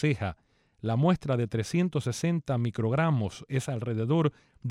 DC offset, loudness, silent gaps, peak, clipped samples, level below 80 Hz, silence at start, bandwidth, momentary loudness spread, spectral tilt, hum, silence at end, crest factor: under 0.1%; -29 LUFS; none; -12 dBFS; under 0.1%; -58 dBFS; 0 s; 13 kHz; 7 LU; -7 dB/octave; none; 0 s; 16 dB